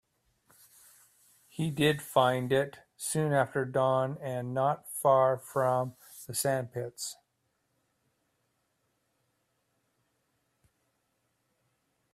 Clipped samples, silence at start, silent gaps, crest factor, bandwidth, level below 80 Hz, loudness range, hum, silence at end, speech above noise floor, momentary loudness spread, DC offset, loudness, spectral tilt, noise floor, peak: under 0.1%; 1.6 s; none; 22 dB; 16 kHz; -70 dBFS; 9 LU; none; 5 s; 49 dB; 12 LU; under 0.1%; -30 LUFS; -5 dB/octave; -78 dBFS; -10 dBFS